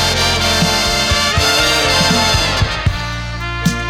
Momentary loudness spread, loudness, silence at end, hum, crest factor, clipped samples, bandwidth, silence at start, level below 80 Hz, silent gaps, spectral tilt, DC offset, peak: 9 LU; -13 LUFS; 0 s; none; 14 dB; under 0.1%; 17 kHz; 0 s; -26 dBFS; none; -3 dB/octave; under 0.1%; -2 dBFS